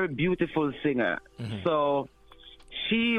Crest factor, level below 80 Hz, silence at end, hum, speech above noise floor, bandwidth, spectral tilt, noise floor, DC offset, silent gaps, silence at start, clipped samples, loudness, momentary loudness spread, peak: 16 dB; -56 dBFS; 0 s; none; 25 dB; 10 kHz; -7.5 dB/octave; -52 dBFS; under 0.1%; none; 0 s; under 0.1%; -28 LUFS; 10 LU; -14 dBFS